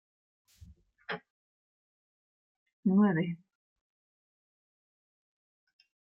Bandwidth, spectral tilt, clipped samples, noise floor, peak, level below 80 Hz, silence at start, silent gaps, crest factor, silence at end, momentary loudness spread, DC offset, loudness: 5.6 kHz; -9.5 dB/octave; under 0.1%; -58 dBFS; -16 dBFS; -72 dBFS; 1.1 s; 1.30-2.66 s, 2.73-2.83 s; 20 dB; 2.8 s; 18 LU; under 0.1%; -31 LUFS